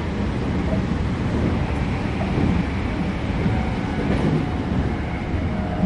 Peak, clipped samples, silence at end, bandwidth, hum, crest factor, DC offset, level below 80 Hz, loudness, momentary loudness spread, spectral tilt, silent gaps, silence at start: -8 dBFS; under 0.1%; 0 s; 10.5 kHz; none; 14 dB; under 0.1%; -28 dBFS; -23 LUFS; 4 LU; -8 dB/octave; none; 0 s